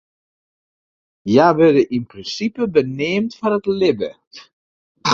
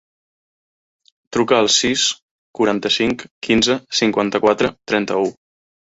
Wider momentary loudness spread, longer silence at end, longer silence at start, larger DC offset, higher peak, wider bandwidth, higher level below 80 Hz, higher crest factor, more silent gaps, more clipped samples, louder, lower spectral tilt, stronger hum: about the same, 12 LU vs 10 LU; second, 0 s vs 0.65 s; about the same, 1.25 s vs 1.3 s; neither; about the same, 0 dBFS vs -2 dBFS; about the same, 7.6 kHz vs 8 kHz; second, -56 dBFS vs -50 dBFS; about the same, 18 dB vs 18 dB; about the same, 4.27-4.31 s, 4.53-4.95 s vs 2.22-2.54 s, 3.31-3.41 s; neither; about the same, -17 LUFS vs -17 LUFS; first, -6 dB/octave vs -3 dB/octave; neither